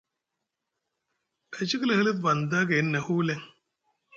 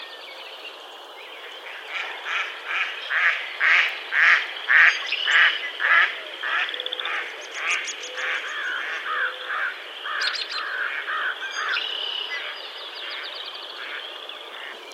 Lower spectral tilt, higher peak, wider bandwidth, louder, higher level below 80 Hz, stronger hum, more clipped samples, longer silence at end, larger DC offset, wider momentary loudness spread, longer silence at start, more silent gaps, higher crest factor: first, -5.5 dB/octave vs 3.5 dB/octave; second, -12 dBFS vs -2 dBFS; second, 7.6 kHz vs 15.5 kHz; second, -26 LUFS vs -22 LUFS; first, -70 dBFS vs under -90 dBFS; neither; neither; about the same, 0 s vs 0 s; neither; second, 10 LU vs 19 LU; first, 1.5 s vs 0 s; neither; second, 18 dB vs 24 dB